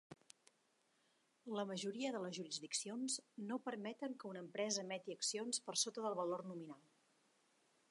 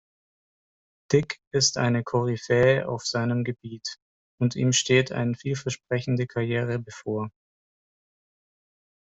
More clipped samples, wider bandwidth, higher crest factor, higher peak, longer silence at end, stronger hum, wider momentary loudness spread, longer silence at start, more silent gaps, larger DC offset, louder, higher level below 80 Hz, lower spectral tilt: neither; first, 11.5 kHz vs 8.2 kHz; about the same, 22 dB vs 20 dB; second, -24 dBFS vs -6 dBFS; second, 1.1 s vs 1.9 s; neither; about the same, 12 LU vs 11 LU; second, 0.1 s vs 1.1 s; second, none vs 1.47-1.51 s, 4.02-4.38 s; neither; second, -44 LUFS vs -25 LUFS; second, under -90 dBFS vs -62 dBFS; second, -2.5 dB/octave vs -4.5 dB/octave